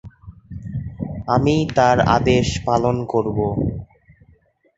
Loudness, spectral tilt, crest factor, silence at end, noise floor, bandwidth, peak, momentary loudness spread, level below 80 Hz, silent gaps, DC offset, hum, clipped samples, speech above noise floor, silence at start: -19 LUFS; -6.5 dB/octave; 18 dB; 0.95 s; -56 dBFS; 8 kHz; -2 dBFS; 15 LU; -38 dBFS; none; under 0.1%; none; under 0.1%; 38 dB; 0.05 s